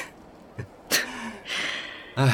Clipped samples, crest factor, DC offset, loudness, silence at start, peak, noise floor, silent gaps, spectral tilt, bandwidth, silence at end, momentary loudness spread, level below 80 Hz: under 0.1%; 20 dB; under 0.1%; -28 LUFS; 0 s; -8 dBFS; -48 dBFS; none; -3.5 dB/octave; 17 kHz; 0 s; 17 LU; -60 dBFS